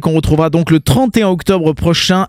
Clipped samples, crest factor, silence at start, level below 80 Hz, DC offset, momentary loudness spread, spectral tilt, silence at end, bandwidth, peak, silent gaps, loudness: under 0.1%; 12 dB; 0 s; -30 dBFS; under 0.1%; 2 LU; -6 dB/octave; 0 s; 16 kHz; 0 dBFS; none; -12 LUFS